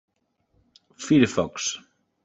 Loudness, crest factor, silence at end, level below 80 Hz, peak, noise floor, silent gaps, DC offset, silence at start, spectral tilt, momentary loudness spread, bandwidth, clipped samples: -23 LUFS; 22 dB; 0.45 s; -60 dBFS; -4 dBFS; -70 dBFS; none; under 0.1%; 1 s; -4.5 dB/octave; 19 LU; 8.2 kHz; under 0.1%